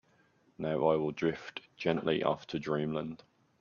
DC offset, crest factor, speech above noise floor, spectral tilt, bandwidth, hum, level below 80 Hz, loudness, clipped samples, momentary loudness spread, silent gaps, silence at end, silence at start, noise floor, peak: under 0.1%; 20 dB; 36 dB; -7 dB/octave; 7.2 kHz; none; -68 dBFS; -33 LUFS; under 0.1%; 13 LU; none; 0.45 s; 0.6 s; -68 dBFS; -14 dBFS